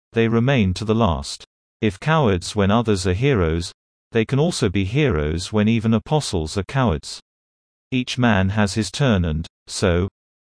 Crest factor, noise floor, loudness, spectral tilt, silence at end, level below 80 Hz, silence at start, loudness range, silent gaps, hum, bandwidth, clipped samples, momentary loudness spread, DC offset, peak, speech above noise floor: 16 dB; under -90 dBFS; -20 LUFS; -6 dB/octave; 0.3 s; -38 dBFS; 0.15 s; 2 LU; 1.47-1.80 s, 3.74-4.11 s, 7.22-7.91 s, 9.50-9.66 s; none; 10.5 kHz; under 0.1%; 9 LU; under 0.1%; -4 dBFS; over 71 dB